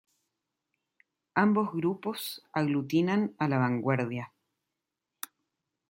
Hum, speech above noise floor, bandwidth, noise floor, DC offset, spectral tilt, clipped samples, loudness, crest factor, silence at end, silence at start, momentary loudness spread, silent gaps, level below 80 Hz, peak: none; 59 dB; 16.5 kHz; -87 dBFS; under 0.1%; -6.5 dB/octave; under 0.1%; -29 LUFS; 22 dB; 1.65 s; 1.35 s; 17 LU; none; -76 dBFS; -10 dBFS